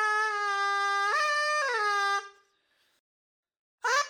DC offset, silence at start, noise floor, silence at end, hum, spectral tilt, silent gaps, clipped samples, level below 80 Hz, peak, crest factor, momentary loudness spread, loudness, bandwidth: under 0.1%; 0 s; -71 dBFS; 0 s; none; 4 dB/octave; 2.99-3.43 s, 3.59-3.78 s; under 0.1%; under -90 dBFS; -14 dBFS; 16 dB; 3 LU; -27 LUFS; 18.5 kHz